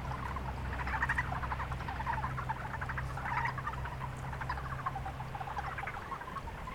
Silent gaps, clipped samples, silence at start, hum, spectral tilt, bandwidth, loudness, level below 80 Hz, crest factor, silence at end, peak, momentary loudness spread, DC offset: none; under 0.1%; 0 s; none; -6 dB/octave; 17 kHz; -38 LUFS; -46 dBFS; 18 dB; 0 s; -18 dBFS; 7 LU; under 0.1%